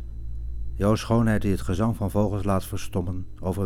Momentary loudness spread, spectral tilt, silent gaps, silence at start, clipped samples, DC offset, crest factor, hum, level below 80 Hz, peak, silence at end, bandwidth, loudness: 14 LU; -7 dB/octave; none; 0 s; under 0.1%; under 0.1%; 16 dB; none; -36 dBFS; -10 dBFS; 0 s; 16.5 kHz; -26 LUFS